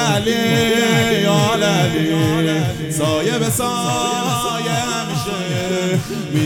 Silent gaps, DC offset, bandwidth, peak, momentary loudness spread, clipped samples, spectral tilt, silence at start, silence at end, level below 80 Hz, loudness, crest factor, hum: none; under 0.1%; 17.5 kHz; -2 dBFS; 6 LU; under 0.1%; -4.5 dB/octave; 0 s; 0 s; -46 dBFS; -17 LUFS; 14 dB; none